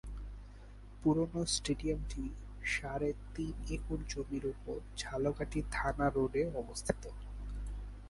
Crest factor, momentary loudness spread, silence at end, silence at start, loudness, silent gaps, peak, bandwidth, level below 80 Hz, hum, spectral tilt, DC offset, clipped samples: 24 dB; 14 LU; 0 s; 0.05 s; -37 LUFS; none; -14 dBFS; 11.5 kHz; -46 dBFS; 50 Hz at -45 dBFS; -5 dB/octave; under 0.1%; under 0.1%